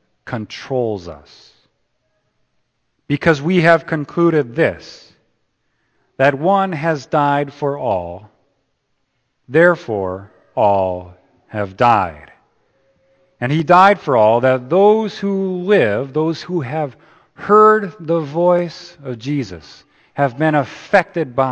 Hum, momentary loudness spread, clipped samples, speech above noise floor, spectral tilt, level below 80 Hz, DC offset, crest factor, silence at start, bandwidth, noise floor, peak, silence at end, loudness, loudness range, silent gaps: none; 15 LU; under 0.1%; 52 dB; -7 dB/octave; -54 dBFS; under 0.1%; 18 dB; 0.25 s; 8.6 kHz; -68 dBFS; 0 dBFS; 0 s; -16 LUFS; 5 LU; none